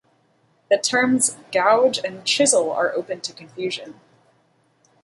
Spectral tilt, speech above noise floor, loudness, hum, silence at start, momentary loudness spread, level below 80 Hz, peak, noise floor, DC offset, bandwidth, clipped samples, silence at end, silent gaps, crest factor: -2 dB/octave; 42 dB; -20 LUFS; none; 0.7 s; 13 LU; -70 dBFS; -4 dBFS; -62 dBFS; under 0.1%; 11.5 kHz; under 0.1%; 1.1 s; none; 18 dB